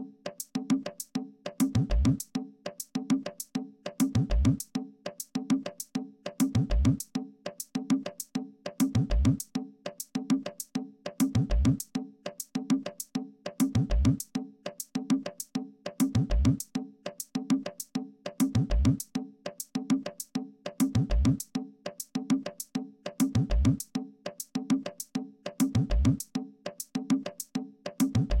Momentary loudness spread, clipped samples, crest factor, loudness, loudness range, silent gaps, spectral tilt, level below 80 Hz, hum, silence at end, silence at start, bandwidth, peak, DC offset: 13 LU; under 0.1%; 16 dB; -31 LUFS; 2 LU; none; -6 dB/octave; -36 dBFS; none; 0 s; 0 s; 16.5 kHz; -14 dBFS; under 0.1%